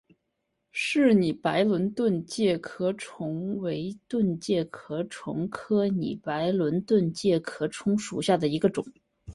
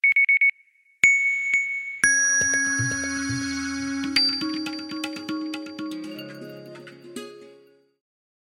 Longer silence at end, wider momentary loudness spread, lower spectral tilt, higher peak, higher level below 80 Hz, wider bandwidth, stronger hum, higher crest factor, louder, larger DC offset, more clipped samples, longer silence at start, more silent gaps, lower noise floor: second, 0 s vs 1.05 s; second, 10 LU vs 22 LU; first, -6 dB/octave vs -1 dB/octave; second, -10 dBFS vs -4 dBFS; about the same, -62 dBFS vs -58 dBFS; second, 11.5 kHz vs 16.5 kHz; neither; about the same, 18 dB vs 22 dB; second, -27 LUFS vs -21 LUFS; neither; neither; first, 0.75 s vs 0.05 s; neither; first, -79 dBFS vs -59 dBFS